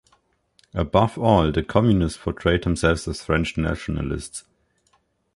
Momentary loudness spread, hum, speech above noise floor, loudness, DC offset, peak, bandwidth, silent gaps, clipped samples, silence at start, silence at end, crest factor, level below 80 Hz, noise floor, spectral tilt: 10 LU; none; 45 dB; -22 LUFS; under 0.1%; -2 dBFS; 11.5 kHz; none; under 0.1%; 0.75 s; 0.95 s; 20 dB; -36 dBFS; -66 dBFS; -6.5 dB/octave